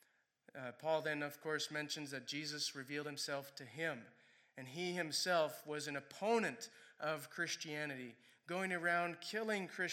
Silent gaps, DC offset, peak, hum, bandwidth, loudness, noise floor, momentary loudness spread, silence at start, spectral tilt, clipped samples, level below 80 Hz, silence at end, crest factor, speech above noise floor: none; under 0.1%; -24 dBFS; none; 17 kHz; -41 LUFS; -71 dBFS; 14 LU; 0.55 s; -3 dB/octave; under 0.1%; under -90 dBFS; 0 s; 20 dB; 30 dB